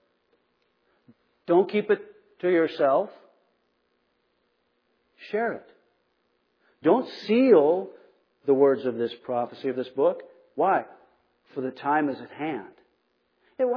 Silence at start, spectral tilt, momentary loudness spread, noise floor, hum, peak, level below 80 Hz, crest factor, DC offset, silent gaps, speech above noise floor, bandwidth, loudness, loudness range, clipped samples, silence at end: 1.5 s; -8 dB/octave; 15 LU; -72 dBFS; none; -6 dBFS; -84 dBFS; 20 dB; under 0.1%; none; 48 dB; 5.4 kHz; -25 LUFS; 8 LU; under 0.1%; 0 s